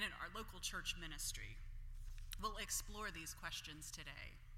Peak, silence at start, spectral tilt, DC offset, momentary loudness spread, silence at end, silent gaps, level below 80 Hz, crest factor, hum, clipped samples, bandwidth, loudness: -28 dBFS; 0 s; -1.5 dB/octave; under 0.1%; 13 LU; 0 s; none; -54 dBFS; 20 dB; none; under 0.1%; 16.5 kHz; -48 LUFS